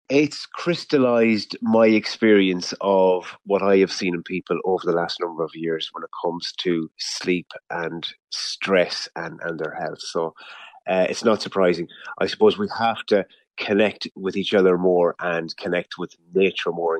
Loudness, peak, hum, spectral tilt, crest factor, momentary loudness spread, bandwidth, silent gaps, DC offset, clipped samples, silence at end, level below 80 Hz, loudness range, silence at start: -22 LUFS; -4 dBFS; none; -5 dB/octave; 18 dB; 11 LU; 10.5 kHz; none; under 0.1%; under 0.1%; 0 s; -68 dBFS; 7 LU; 0.1 s